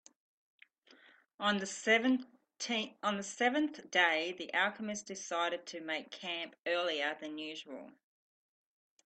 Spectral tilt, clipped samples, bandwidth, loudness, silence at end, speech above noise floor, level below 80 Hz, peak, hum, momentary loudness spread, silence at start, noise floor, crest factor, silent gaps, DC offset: -2.5 dB/octave; under 0.1%; 9 kHz; -34 LUFS; 1.15 s; 29 dB; -84 dBFS; -14 dBFS; none; 13 LU; 1.4 s; -64 dBFS; 22 dB; 6.59-6.64 s; under 0.1%